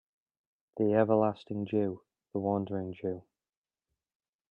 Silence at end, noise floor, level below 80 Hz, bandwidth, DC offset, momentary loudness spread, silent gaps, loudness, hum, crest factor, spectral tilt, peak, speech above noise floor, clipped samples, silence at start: 1.3 s; under -90 dBFS; -76 dBFS; 5.4 kHz; under 0.1%; 15 LU; none; -31 LUFS; none; 22 dB; -10.5 dB/octave; -12 dBFS; over 60 dB; under 0.1%; 0.75 s